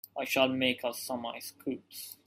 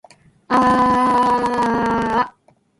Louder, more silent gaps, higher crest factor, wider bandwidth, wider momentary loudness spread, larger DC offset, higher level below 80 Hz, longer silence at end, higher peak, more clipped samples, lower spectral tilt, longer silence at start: second, -32 LUFS vs -17 LUFS; neither; first, 22 dB vs 14 dB; first, 16 kHz vs 11.5 kHz; first, 13 LU vs 5 LU; neither; second, -76 dBFS vs -46 dBFS; second, 0.15 s vs 0.5 s; second, -10 dBFS vs -4 dBFS; neither; second, -3 dB/octave vs -5.5 dB/octave; second, 0.15 s vs 0.5 s